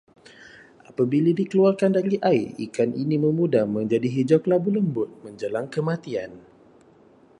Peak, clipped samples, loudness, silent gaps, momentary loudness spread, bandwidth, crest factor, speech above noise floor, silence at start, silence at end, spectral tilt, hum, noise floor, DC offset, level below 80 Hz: -6 dBFS; under 0.1%; -23 LUFS; none; 11 LU; 10.5 kHz; 18 dB; 32 dB; 0.4 s; 1 s; -8 dB/octave; none; -54 dBFS; under 0.1%; -66 dBFS